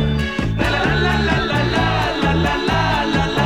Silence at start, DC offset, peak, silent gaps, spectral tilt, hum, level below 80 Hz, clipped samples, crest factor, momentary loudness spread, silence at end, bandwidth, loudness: 0 s; 0.6%; -4 dBFS; none; -6 dB/octave; none; -28 dBFS; under 0.1%; 12 dB; 3 LU; 0 s; 16 kHz; -18 LUFS